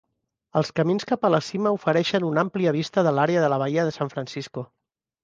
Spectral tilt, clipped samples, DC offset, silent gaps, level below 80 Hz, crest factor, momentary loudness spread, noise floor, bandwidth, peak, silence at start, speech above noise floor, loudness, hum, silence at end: -6.5 dB/octave; under 0.1%; under 0.1%; none; -66 dBFS; 20 dB; 11 LU; -71 dBFS; 7.8 kHz; -4 dBFS; 0.55 s; 48 dB; -23 LUFS; none; 0.6 s